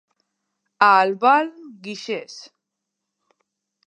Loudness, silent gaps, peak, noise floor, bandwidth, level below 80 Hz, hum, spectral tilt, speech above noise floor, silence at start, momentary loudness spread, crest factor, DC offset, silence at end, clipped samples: -18 LUFS; none; -2 dBFS; -81 dBFS; 9.2 kHz; -84 dBFS; none; -4 dB/octave; 62 dB; 0.8 s; 23 LU; 22 dB; under 0.1%; 1.45 s; under 0.1%